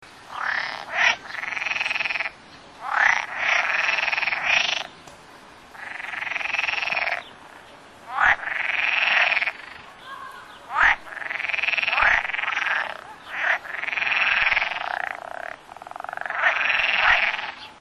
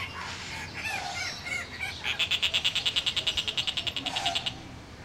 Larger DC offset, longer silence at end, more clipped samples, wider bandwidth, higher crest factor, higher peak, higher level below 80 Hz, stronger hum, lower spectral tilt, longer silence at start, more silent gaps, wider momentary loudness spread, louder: neither; about the same, 0 s vs 0 s; neither; second, 13 kHz vs 17 kHz; about the same, 22 dB vs 22 dB; first, -4 dBFS vs -10 dBFS; about the same, -54 dBFS vs -54 dBFS; neither; about the same, -0.5 dB/octave vs -1.5 dB/octave; about the same, 0 s vs 0 s; neither; first, 18 LU vs 11 LU; first, -22 LUFS vs -29 LUFS